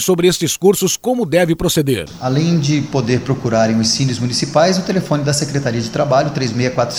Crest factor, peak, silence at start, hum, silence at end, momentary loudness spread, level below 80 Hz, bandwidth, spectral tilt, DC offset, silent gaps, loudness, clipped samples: 16 dB; 0 dBFS; 0 s; none; 0 s; 5 LU; -42 dBFS; 17 kHz; -5 dB/octave; under 0.1%; none; -16 LUFS; under 0.1%